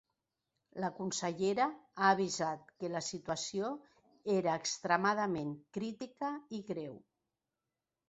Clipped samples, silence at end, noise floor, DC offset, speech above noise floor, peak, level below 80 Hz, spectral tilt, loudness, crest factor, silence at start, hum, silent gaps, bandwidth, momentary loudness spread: under 0.1%; 1.1 s; under -90 dBFS; under 0.1%; over 54 dB; -14 dBFS; -76 dBFS; -3.5 dB/octave; -36 LUFS; 22 dB; 0.75 s; none; none; 8 kHz; 12 LU